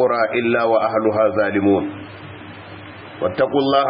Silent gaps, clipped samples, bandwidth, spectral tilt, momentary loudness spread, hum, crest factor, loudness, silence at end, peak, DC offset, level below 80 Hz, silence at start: none; under 0.1%; 5.4 kHz; -11 dB/octave; 19 LU; none; 16 dB; -18 LUFS; 0 s; -4 dBFS; under 0.1%; -58 dBFS; 0 s